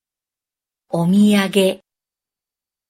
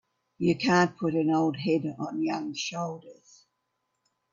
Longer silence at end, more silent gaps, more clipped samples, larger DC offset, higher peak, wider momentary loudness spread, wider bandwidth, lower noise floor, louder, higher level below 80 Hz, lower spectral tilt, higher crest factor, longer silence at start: about the same, 1.15 s vs 1.2 s; neither; neither; neither; first, -2 dBFS vs -10 dBFS; about the same, 12 LU vs 10 LU; first, 15.5 kHz vs 7.4 kHz; first, -89 dBFS vs -79 dBFS; first, -16 LUFS vs -28 LUFS; first, -62 dBFS vs -68 dBFS; about the same, -6 dB/octave vs -5.5 dB/octave; about the same, 18 dB vs 20 dB; first, 0.95 s vs 0.4 s